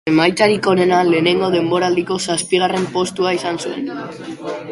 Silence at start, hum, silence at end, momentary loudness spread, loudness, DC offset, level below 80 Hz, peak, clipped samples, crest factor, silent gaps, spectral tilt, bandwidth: 0.05 s; none; 0 s; 13 LU; -16 LUFS; under 0.1%; -56 dBFS; 0 dBFS; under 0.1%; 16 dB; none; -4.5 dB/octave; 11.5 kHz